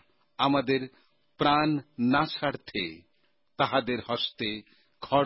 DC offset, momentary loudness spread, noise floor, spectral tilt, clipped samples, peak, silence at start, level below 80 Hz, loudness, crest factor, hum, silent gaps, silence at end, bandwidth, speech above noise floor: under 0.1%; 11 LU; -74 dBFS; -9.5 dB/octave; under 0.1%; -10 dBFS; 0.4 s; -60 dBFS; -28 LUFS; 20 dB; none; none; 0 s; 5.8 kHz; 46 dB